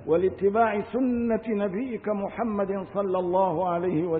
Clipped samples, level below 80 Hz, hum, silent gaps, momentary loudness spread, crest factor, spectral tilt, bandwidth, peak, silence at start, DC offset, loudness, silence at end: under 0.1%; -56 dBFS; none; none; 6 LU; 14 dB; -12 dB/octave; 4 kHz; -12 dBFS; 0 s; under 0.1%; -26 LUFS; 0 s